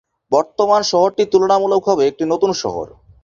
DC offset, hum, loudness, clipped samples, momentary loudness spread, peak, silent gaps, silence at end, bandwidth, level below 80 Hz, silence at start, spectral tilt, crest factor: under 0.1%; none; -16 LUFS; under 0.1%; 9 LU; -2 dBFS; none; 0.35 s; 7.4 kHz; -54 dBFS; 0.3 s; -4.5 dB/octave; 14 dB